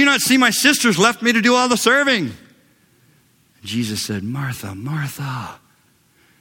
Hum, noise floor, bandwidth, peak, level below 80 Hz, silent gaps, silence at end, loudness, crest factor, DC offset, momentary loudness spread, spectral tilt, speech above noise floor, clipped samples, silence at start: none; -57 dBFS; 17.5 kHz; 0 dBFS; -60 dBFS; none; 0.85 s; -17 LUFS; 18 dB; under 0.1%; 15 LU; -3 dB/octave; 40 dB; under 0.1%; 0 s